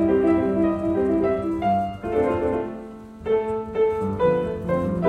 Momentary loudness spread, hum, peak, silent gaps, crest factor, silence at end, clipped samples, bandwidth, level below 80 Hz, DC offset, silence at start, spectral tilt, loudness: 7 LU; none; -8 dBFS; none; 14 dB; 0 s; under 0.1%; 9 kHz; -44 dBFS; under 0.1%; 0 s; -9 dB/octave; -23 LUFS